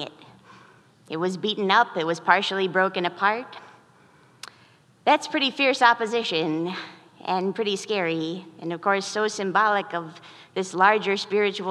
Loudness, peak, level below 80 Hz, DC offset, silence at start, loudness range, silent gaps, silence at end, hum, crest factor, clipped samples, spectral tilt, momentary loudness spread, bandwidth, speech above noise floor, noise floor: -23 LUFS; -2 dBFS; -82 dBFS; under 0.1%; 0 s; 3 LU; none; 0 s; none; 22 dB; under 0.1%; -4 dB/octave; 16 LU; 12 kHz; 33 dB; -56 dBFS